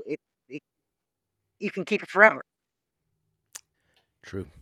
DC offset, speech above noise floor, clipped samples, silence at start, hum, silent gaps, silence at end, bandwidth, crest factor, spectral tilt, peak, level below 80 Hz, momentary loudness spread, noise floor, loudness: under 0.1%; 61 dB; under 0.1%; 0 s; none; none; 0.15 s; 14 kHz; 28 dB; -5 dB/octave; -2 dBFS; -68 dBFS; 27 LU; -85 dBFS; -22 LUFS